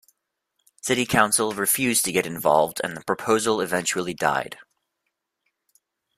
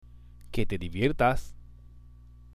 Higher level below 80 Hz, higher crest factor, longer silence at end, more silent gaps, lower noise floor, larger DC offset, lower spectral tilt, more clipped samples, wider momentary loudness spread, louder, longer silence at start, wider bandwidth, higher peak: second, -60 dBFS vs -40 dBFS; about the same, 22 dB vs 20 dB; first, 1.55 s vs 0.05 s; neither; first, -79 dBFS vs -51 dBFS; second, under 0.1% vs 0.1%; second, -3 dB/octave vs -6.5 dB/octave; neither; second, 9 LU vs 12 LU; first, -22 LUFS vs -29 LUFS; first, 0.85 s vs 0.15 s; first, 16 kHz vs 13.5 kHz; first, -2 dBFS vs -10 dBFS